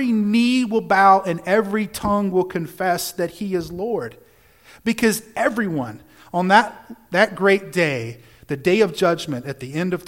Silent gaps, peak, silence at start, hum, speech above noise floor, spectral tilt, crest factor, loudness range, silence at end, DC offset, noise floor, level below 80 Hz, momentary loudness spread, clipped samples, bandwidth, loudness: none; 0 dBFS; 0 s; none; 31 dB; -5 dB/octave; 20 dB; 5 LU; 0 s; under 0.1%; -51 dBFS; -52 dBFS; 12 LU; under 0.1%; 17 kHz; -20 LUFS